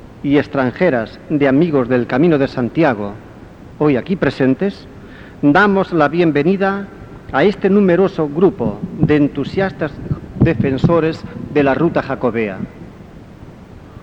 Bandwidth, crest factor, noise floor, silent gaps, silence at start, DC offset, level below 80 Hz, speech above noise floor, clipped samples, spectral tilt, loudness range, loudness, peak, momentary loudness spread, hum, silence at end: 7.8 kHz; 16 dB; -37 dBFS; none; 0 s; 0.1%; -40 dBFS; 22 dB; under 0.1%; -8.5 dB/octave; 3 LU; -15 LUFS; 0 dBFS; 12 LU; none; 0.05 s